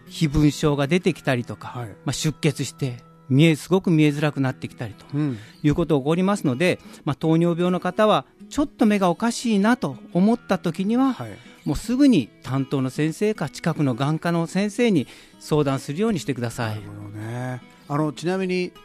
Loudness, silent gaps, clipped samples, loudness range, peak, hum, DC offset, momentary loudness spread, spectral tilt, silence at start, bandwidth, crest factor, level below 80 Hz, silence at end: -22 LUFS; none; under 0.1%; 3 LU; -4 dBFS; none; under 0.1%; 12 LU; -6.5 dB/octave; 0.05 s; 14 kHz; 18 dB; -46 dBFS; 0.05 s